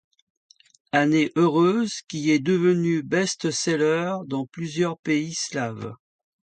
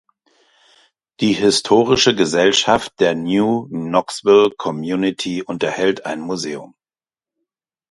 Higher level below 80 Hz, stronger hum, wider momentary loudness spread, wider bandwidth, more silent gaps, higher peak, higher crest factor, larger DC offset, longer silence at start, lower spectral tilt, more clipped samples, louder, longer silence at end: second, -68 dBFS vs -54 dBFS; neither; about the same, 9 LU vs 11 LU; second, 9.4 kHz vs 11.5 kHz; first, 4.99-5.03 s vs none; second, -6 dBFS vs 0 dBFS; about the same, 16 dB vs 18 dB; neither; second, 0.95 s vs 1.2 s; about the same, -5 dB/octave vs -4 dB/octave; neither; second, -23 LUFS vs -17 LUFS; second, 0.6 s vs 1.25 s